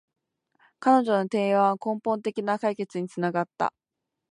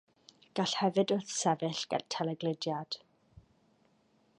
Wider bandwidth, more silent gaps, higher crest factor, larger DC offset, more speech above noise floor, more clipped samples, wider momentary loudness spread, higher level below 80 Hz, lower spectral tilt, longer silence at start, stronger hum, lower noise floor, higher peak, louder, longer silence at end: about the same, 11 kHz vs 11 kHz; neither; about the same, 18 dB vs 20 dB; neither; first, 60 dB vs 37 dB; neither; about the same, 9 LU vs 10 LU; about the same, -78 dBFS vs -76 dBFS; first, -7 dB/octave vs -4 dB/octave; first, 0.8 s vs 0.55 s; neither; first, -85 dBFS vs -70 dBFS; first, -8 dBFS vs -14 dBFS; first, -26 LUFS vs -33 LUFS; second, 0.65 s vs 1.4 s